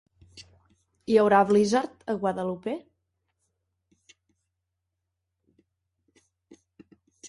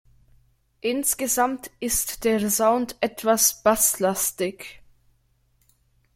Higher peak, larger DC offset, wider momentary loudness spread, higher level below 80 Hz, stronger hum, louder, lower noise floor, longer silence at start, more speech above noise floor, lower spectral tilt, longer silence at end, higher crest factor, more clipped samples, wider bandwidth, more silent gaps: about the same, -8 dBFS vs -6 dBFS; neither; first, 15 LU vs 11 LU; second, -68 dBFS vs -52 dBFS; neither; about the same, -24 LUFS vs -22 LUFS; first, -82 dBFS vs -65 dBFS; second, 0.35 s vs 0.85 s; first, 59 dB vs 42 dB; first, -5.5 dB/octave vs -2.5 dB/octave; second, 0 s vs 1.45 s; about the same, 22 dB vs 20 dB; neither; second, 11.5 kHz vs 16.5 kHz; neither